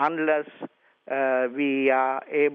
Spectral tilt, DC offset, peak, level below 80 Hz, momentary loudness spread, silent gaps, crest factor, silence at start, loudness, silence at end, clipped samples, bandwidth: -7.5 dB/octave; under 0.1%; -8 dBFS; -88 dBFS; 17 LU; none; 16 dB; 0 s; -24 LUFS; 0 s; under 0.1%; 4.8 kHz